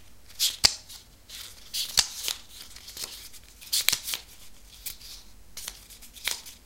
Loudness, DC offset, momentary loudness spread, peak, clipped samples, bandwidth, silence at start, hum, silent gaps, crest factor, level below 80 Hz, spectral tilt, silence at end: -28 LUFS; 0.2%; 23 LU; 0 dBFS; under 0.1%; 17 kHz; 0 s; none; none; 32 dB; -54 dBFS; 1.5 dB/octave; 0 s